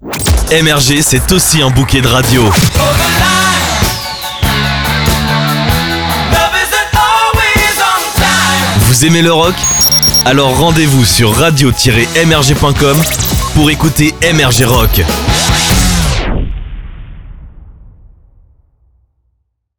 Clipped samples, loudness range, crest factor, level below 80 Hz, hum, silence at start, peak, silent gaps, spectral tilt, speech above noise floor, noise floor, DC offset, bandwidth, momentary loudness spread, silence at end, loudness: under 0.1%; 5 LU; 10 dB; -20 dBFS; none; 0 s; 0 dBFS; none; -3.5 dB/octave; 54 dB; -63 dBFS; under 0.1%; over 20 kHz; 5 LU; 1.9 s; -9 LUFS